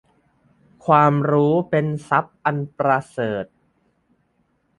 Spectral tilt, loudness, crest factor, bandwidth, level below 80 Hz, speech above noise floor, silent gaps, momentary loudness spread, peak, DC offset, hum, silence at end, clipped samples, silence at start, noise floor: -8.5 dB/octave; -20 LUFS; 20 dB; 11.5 kHz; -60 dBFS; 47 dB; none; 11 LU; -2 dBFS; under 0.1%; none; 1.35 s; under 0.1%; 0.85 s; -66 dBFS